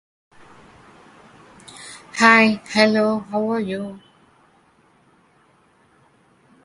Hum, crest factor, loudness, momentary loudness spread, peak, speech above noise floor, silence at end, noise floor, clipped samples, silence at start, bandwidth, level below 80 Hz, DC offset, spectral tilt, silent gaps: none; 22 dB; -17 LUFS; 25 LU; 0 dBFS; 40 dB; 2.65 s; -57 dBFS; under 0.1%; 1.8 s; 11.5 kHz; -64 dBFS; under 0.1%; -4.5 dB/octave; none